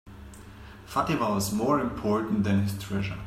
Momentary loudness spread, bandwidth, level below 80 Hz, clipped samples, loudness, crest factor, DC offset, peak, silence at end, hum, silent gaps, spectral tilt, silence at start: 21 LU; 15.5 kHz; -50 dBFS; under 0.1%; -27 LUFS; 18 dB; under 0.1%; -10 dBFS; 0 s; none; none; -6 dB/octave; 0.05 s